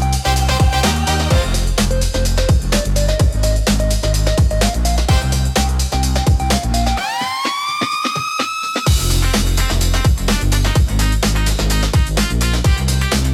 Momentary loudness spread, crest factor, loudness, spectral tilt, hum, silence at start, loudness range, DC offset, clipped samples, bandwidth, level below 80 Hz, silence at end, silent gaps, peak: 3 LU; 12 dB; -16 LUFS; -4.5 dB/octave; none; 0 s; 1 LU; under 0.1%; under 0.1%; 16 kHz; -18 dBFS; 0 s; none; -4 dBFS